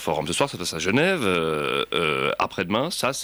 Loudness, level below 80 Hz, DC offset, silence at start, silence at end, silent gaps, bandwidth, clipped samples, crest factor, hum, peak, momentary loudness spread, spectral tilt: -23 LUFS; -54 dBFS; under 0.1%; 0 s; 0 s; none; over 20 kHz; under 0.1%; 16 dB; none; -8 dBFS; 4 LU; -4 dB/octave